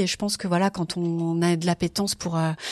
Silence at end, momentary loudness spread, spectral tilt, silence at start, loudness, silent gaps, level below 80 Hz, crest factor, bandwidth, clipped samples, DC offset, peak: 0 s; 3 LU; -5 dB/octave; 0 s; -25 LUFS; none; -56 dBFS; 14 dB; 14 kHz; under 0.1%; under 0.1%; -12 dBFS